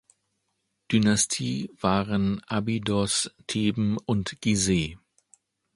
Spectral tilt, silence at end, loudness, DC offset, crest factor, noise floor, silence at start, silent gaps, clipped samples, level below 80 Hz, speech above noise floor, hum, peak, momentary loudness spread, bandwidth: -4.5 dB/octave; 0.8 s; -26 LUFS; under 0.1%; 20 dB; -77 dBFS; 0.9 s; none; under 0.1%; -50 dBFS; 52 dB; none; -6 dBFS; 6 LU; 11.5 kHz